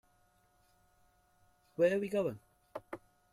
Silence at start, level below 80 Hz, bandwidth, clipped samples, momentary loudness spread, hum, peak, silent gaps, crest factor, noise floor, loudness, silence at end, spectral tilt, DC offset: 1.8 s; -74 dBFS; 14.5 kHz; under 0.1%; 20 LU; none; -18 dBFS; none; 20 dB; -71 dBFS; -33 LUFS; 0.35 s; -6.5 dB/octave; under 0.1%